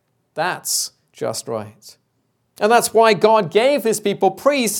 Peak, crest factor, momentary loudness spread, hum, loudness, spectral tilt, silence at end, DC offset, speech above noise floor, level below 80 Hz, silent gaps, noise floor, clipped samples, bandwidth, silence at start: 0 dBFS; 18 dB; 15 LU; none; -17 LUFS; -3 dB/octave; 0 s; under 0.1%; 50 dB; -70 dBFS; none; -67 dBFS; under 0.1%; 18.5 kHz; 0.35 s